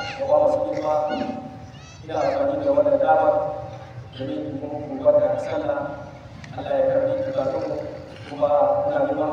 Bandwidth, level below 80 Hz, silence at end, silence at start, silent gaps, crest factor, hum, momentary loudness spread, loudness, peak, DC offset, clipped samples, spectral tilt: 7.2 kHz; -54 dBFS; 0 s; 0 s; none; 16 dB; none; 18 LU; -22 LUFS; -6 dBFS; under 0.1%; under 0.1%; -7 dB/octave